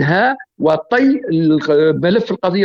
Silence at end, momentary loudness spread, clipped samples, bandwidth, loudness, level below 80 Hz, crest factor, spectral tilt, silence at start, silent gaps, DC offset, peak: 0 s; 4 LU; under 0.1%; 7 kHz; -15 LUFS; -54 dBFS; 10 dB; -8 dB/octave; 0 s; none; under 0.1%; -4 dBFS